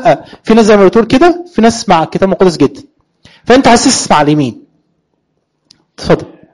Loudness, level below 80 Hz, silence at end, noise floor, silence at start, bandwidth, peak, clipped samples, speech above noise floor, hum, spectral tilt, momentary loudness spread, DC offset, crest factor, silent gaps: -9 LUFS; -36 dBFS; 0.3 s; -63 dBFS; 0 s; 11.5 kHz; 0 dBFS; 0.1%; 55 dB; none; -4.5 dB/octave; 8 LU; under 0.1%; 10 dB; none